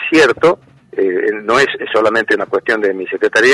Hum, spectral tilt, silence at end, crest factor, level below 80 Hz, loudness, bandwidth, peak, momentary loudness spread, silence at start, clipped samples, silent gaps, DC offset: none; -4 dB/octave; 0 s; 12 dB; -54 dBFS; -14 LUFS; 11.5 kHz; -2 dBFS; 7 LU; 0 s; under 0.1%; none; under 0.1%